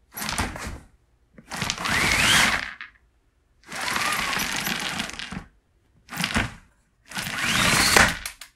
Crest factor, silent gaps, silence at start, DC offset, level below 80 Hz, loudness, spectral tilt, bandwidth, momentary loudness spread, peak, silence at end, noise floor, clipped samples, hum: 26 dB; none; 0.15 s; under 0.1%; -44 dBFS; -22 LUFS; -2 dB/octave; 16.5 kHz; 20 LU; 0 dBFS; 0.1 s; -64 dBFS; under 0.1%; none